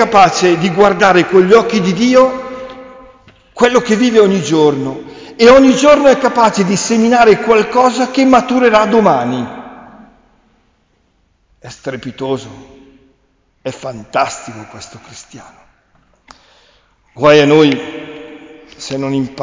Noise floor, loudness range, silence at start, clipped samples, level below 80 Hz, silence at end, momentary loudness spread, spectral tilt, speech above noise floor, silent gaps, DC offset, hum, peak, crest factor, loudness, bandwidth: -57 dBFS; 17 LU; 0 s; under 0.1%; -46 dBFS; 0 s; 20 LU; -5 dB/octave; 47 dB; none; under 0.1%; none; 0 dBFS; 12 dB; -10 LUFS; 7.6 kHz